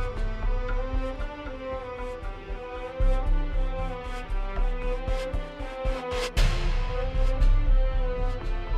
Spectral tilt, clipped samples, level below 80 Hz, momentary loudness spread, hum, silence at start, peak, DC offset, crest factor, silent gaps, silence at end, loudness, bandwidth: -6 dB/octave; under 0.1%; -26 dBFS; 9 LU; none; 0 s; -12 dBFS; under 0.1%; 14 dB; none; 0 s; -31 LUFS; 9 kHz